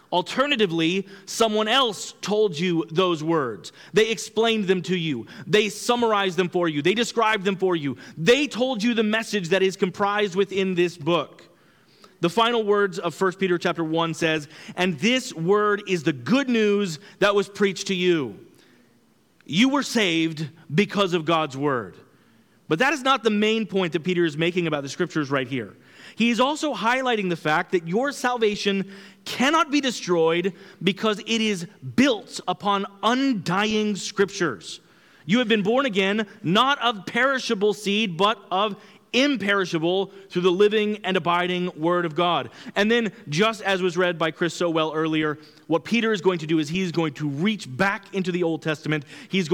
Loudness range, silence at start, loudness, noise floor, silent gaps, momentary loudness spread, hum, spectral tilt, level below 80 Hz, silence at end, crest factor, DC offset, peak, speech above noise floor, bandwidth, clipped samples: 2 LU; 0.1 s; -23 LUFS; -60 dBFS; none; 7 LU; none; -4.5 dB/octave; -66 dBFS; 0 s; 16 dB; under 0.1%; -8 dBFS; 38 dB; 17 kHz; under 0.1%